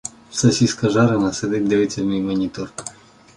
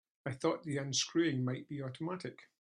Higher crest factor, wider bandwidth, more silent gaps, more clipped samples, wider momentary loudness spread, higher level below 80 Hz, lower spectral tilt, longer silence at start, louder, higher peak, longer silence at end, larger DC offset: about the same, 16 dB vs 18 dB; about the same, 11.5 kHz vs 11 kHz; neither; neither; first, 14 LU vs 11 LU; first, -50 dBFS vs -76 dBFS; about the same, -5.5 dB/octave vs -4.5 dB/octave; second, 0.05 s vs 0.25 s; first, -19 LUFS vs -36 LUFS; first, -4 dBFS vs -20 dBFS; first, 0.45 s vs 0.15 s; neither